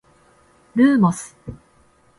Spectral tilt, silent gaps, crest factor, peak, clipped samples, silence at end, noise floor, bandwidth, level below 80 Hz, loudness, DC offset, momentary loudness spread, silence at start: -6.5 dB/octave; none; 18 dB; -4 dBFS; under 0.1%; 0.65 s; -56 dBFS; 11.5 kHz; -52 dBFS; -18 LUFS; under 0.1%; 24 LU; 0.75 s